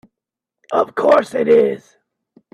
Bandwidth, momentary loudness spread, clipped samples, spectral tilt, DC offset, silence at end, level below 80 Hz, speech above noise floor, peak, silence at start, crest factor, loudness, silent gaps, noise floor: 11.5 kHz; 8 LU; under 0.1%; -6 dB/octave; under 0.1%; 0.75 s; -66 dBFS; 69 dB; 0 dBFS; 0.7 s; 18 dB; -15 LUFS; none; -84 dBFS